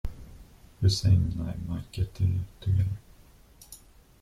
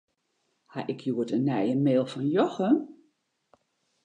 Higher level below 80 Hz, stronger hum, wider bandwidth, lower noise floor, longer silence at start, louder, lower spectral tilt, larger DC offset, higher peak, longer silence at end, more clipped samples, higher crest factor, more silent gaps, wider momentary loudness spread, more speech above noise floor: first, -42 dBFS vs -80 dBFS; neither; first, 12.5 kHz vs 9.6 kHz; second, -55 dBFS vs -76 dBFS; second, 0.05 s vs 0.75 s; about the same, -28 LUFS vs -27 LUFS; second, -6.5 dB/octave vs -8 dB/octave; neither; about the same, -12 dBFS vs -10 dBFS; second, 0.45 s vs 1.1 s; neither; about the same, 18 dB vs 18 dB; neither; first, 24 LU vs 12 LU; second, 29 dB vs 50 dB